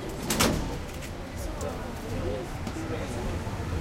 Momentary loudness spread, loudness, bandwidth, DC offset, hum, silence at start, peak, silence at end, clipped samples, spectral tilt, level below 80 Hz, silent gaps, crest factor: 11 LU; -32 LUFS; 16.5 kHz; under 0.1%; none; 0 s; -8 dBFS; 0 s; under 0.1%; -4.5 dB/octave; -38 dBFS; none; 24 dB